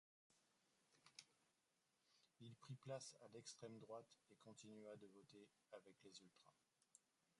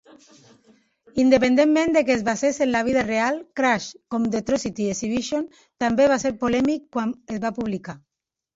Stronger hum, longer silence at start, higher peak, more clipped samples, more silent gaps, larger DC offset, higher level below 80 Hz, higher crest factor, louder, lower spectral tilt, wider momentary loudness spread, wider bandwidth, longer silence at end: neither; second, 0.3 s vs 1.15 s; second, -40 dBFS vs -4 dBFS; neither; neither; neither; second, under -90 dBFS vs -54 dBFS; first, 24 dB vs 18 dB; second, -62 LUFS vs -22 LUFS; about the same, -4.5 dB/octave vs -4.5 dB/octave; about the same, 11 LU vs 11 LU; first, 11 kHz vs 8 kHz; second, 0.4 s vs 0.6 s